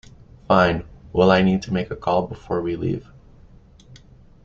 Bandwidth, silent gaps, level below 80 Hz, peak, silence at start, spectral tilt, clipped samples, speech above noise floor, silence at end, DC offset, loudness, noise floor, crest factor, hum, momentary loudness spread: 7.2 kHz; none; -46 dBFS; -2 dBFS; 0.5 s; -7.5 dB/octave; under 0.1%; 28 dB; 0.45 s; under 0.1%; -21 LUFS; -48 dBFS; 20 dB; none; 11 LU